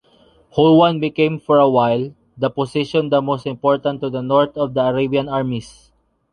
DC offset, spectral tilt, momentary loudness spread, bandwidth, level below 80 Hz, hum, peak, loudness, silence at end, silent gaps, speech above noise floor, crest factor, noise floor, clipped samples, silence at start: under 0.1%; -7.5 dB/octave; 10 LU; 10.5 kHz; -54 dBFS; none; -2 dBFS; -17 LUFS; 0.65 s; none; 36 dB; 16 dB; -53 dBFS; under 0.1%; 0.55 s